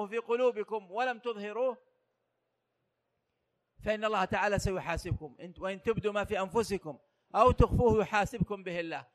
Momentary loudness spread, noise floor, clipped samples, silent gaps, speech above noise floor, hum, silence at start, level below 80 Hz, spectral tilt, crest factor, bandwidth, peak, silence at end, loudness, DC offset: 13 LU; -82 dBFS; under 0.1%; none; 51 dB; none; 0 s; -44 dBFS; -6 dB/octave; 24 dB; 13.5 kHz; -10 dBFS; 0.1 s; -31 LUFS; under 0.1%